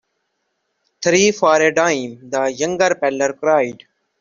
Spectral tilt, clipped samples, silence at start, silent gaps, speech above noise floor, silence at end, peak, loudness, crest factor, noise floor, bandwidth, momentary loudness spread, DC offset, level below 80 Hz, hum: -3.5 dB/octave; under 0.1%; 1 s; none; 55 dB; 0.5 s; -2 dBFS; -17 LUFS; 16 dB; -71 dBFS; 7.6 kHz; 9 LU; under 0.1%; -60 dBFS; none